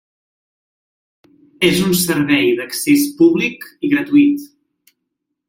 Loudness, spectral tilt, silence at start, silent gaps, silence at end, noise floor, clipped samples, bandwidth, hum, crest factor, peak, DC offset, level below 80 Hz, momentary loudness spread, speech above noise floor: -15 LUFS; -4.5 dB/octave; 1.6 s; none; 1 s; -76 dBFS; under 0.1%; 16.5 kHz; none; 16 dB; -2 dBFS; under 0.1%; -54 dBFS; 6 LU; 61 dB